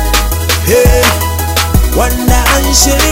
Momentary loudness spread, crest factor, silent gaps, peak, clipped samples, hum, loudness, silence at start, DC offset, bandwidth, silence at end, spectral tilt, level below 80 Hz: 5 LU; 10 dB; none; 0 dBFS; 0.2%; none; -9 LUFS; 0 s; under 0.1%; 16.5 kHz; 0 s; -3.5 dB/octave; -14 dBFS